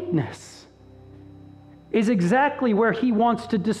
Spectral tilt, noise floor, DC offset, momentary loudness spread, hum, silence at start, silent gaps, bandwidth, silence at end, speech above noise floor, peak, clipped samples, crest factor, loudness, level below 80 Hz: -7 dB/octave; -48 dBFS; under 0.1%; 11 LU; none; 0 s; none; 11.5 kHz; 0 s; 27 dB; -8 dBFS; under 0.1%; 16 dB; -22 LUFS; -58 dBFS